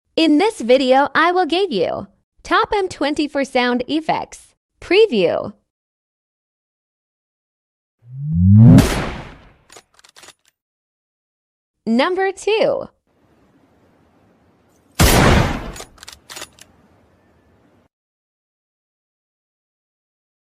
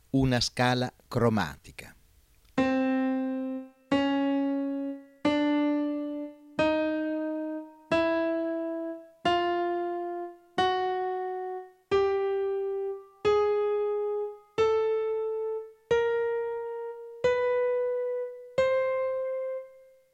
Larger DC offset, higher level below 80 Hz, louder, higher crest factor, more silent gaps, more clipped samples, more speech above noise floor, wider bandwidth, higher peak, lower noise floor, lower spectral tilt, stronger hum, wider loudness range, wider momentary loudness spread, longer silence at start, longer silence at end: neither; first, -34 dBFS vs -56 dBFS; first, -16 LUFS vs -29 LUFS; about the same, 18 dB vs 18 dB; first, 2.24-2.32 s, 4.57-4.69 s, 5.70-7.98 s, 10.62-11.74 s vs none; neither; first, 41 dB vs 33 dB; about the same, 15.5 kHz vs 14.5 kHz; first, 0 dBFS vs -12 dBFS; second, -57 dBFS vs -61 dBFS; about the same, -6 dB/octave vs -6 dB/octave; neither; first, 9 LU vs 2 LU; first, 22 LU vs 11 LU; about the same, 0.15 s vs 0.15 s; first, 4.1 s vs 0.35 s